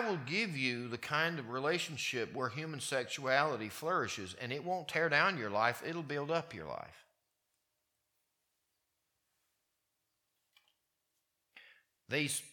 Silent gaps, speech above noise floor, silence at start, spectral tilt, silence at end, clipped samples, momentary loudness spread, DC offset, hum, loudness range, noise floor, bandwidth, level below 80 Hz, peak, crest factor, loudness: none; 48 dB; 0 s; -3.5 dB/octave; 0 s; under 0.1%; 9 LU; under 0.1%; none; 11 LU; -84 dBFS; 19 kHz; -80 dBFS; -14 dBFS; 26 dB; -35 LUFS